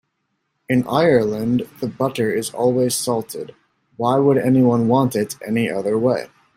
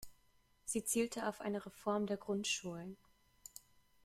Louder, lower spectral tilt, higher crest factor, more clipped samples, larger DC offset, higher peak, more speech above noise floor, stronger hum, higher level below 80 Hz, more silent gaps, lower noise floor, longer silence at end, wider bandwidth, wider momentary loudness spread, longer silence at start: first, -19 LUFS vs -40 LUFS; first, -6 dB/octave vs -3.5 dB/octave; about the same, 16 dB vs 18 dB; neither; neither; first, -2 dBFS vs -24 dBFS; first, 54 dB vs 33 dB; neither; first, -58 dBFS vs -72 dBFS; neither; about the same, -72 dBFS vs -72 dBFS; second, 0.3 s vs 0.45 s; about the same, 16 kHz vs 16 kHz; second, 9 LU vs 21 LU; first, 0.7 s vs 0 s